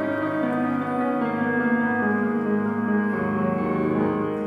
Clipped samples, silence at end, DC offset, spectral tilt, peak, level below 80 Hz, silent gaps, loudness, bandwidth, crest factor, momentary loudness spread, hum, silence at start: under 0.1%; 0 s; under 0.1%; -9 dB/octave; -12 dBFS; -58 dBFS; none; -23 LUFS; 4.9 kHz; 12 dB; 3 LU; none; 0 s